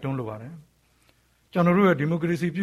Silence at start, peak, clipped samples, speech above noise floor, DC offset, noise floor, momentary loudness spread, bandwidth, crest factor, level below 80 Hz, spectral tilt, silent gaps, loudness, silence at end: 0 s; -8 dBFS; under 0.1%; 40 dB; under 0.1%; -63 dBFS; 18 LU; 12.5 kHz; 16 dB; -60 dBFS; -8 dB/octave; none; -23 LUFS; 0 s